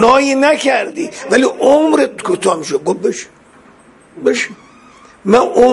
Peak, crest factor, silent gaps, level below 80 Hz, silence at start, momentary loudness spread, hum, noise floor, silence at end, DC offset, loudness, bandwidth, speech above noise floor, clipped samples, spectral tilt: 0 dBFS; 14 dB; none; -50 dBFS; 0 s; 12 LU; none; -44 dBFS; 0 s; under 0.1%; -13 LUFS; 11.5 kHz; 31 dB; under 0.1%; -4 dB/octave